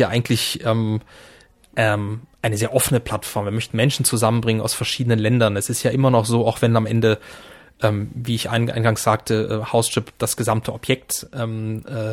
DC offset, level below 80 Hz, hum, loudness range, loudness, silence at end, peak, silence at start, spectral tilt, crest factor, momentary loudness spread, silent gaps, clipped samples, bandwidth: under 0.1%; -50 dBFS; none; 3 LU; -20 LUFS; 0 s; -2 dBFS; 0 s; -5 dB/octave; 18 dB; 8 LU; none; under 0.1%; 16.5 kHz